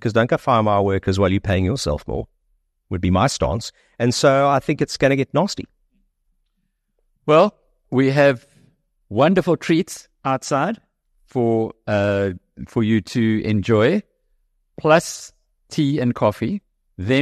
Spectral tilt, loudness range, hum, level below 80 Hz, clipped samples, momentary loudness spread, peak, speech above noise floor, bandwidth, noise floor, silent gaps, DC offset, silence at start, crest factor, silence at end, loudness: -6 dB/octave; 3 LU; none; -44 dBFS; under 0.1%; 13 LU; -2 dBFS; 53 dB; 13 kHz; -71 dBFS; none; under 0.1%; 0 s; 18 dB; 0 s; -19 LUFS